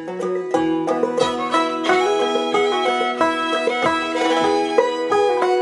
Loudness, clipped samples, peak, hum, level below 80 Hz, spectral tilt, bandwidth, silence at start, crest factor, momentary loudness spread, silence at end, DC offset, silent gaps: -19 LUFS; under 0.1%; -2 dBFS; none; -58 dBFS; -3.5 dB/octave; 11.5 kHz; 0 s; 16 dB; 3 LU; 0 s; under 0.1%; none